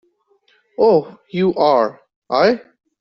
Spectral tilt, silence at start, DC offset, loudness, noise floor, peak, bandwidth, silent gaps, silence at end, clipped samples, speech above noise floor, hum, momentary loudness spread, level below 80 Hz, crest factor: -4.5 dB/octave; 0.8 s; under 0.1%; -17 LUFS; -60 dBFS; -2 dBFS; 6.2 kHz; 2.16-2.22 s; 0.4 s; under 0.1%; 44 dB; none; 11 LU; -60 dBFS; 16 dB